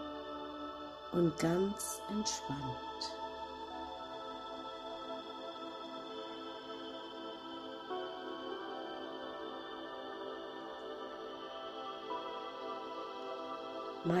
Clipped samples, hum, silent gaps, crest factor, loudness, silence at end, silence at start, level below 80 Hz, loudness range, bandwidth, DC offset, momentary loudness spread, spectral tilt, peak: under 0.1%; none; none; 22 dB; -42 LUFS; 0 s; 0 s; -68 dBFS; 7 LU; 15.5 kHz; under 0.1%; 10 LU; -4.5 dB/octave; -20 dBFS